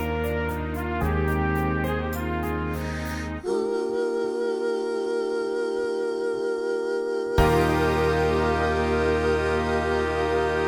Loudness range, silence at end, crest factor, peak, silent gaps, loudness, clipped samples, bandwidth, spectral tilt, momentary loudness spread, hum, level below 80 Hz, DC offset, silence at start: 4 LU; 0 s; 18 dB; -6 dBFS; none; -25 LUFS; under 0.1%; over 20 kHz; -6.5 dB/octave; 6 LU; none; -36 dBFS; under 0.1%; 0 s